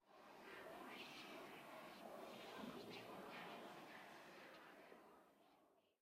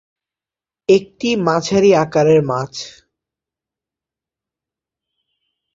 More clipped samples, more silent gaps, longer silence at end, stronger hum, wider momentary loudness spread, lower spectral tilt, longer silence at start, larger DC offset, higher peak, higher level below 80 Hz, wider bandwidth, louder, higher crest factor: neither; neither; second, 0.1 s vs 2.85 s; neither; second, 8 LU vs 14 LU; second, -4 dB/octave vs -5.5 dB/octave; second, 0 s vs 0.9 s; neither; second, -42 dBFS vs -2 dBFS; second, under -90 dBFS vs -58 dBFS; first, 16 kHz vs 7.8 kHz; second, -58 LUFS vs -15 LUFS; about the same, 16 dB vs 18 dB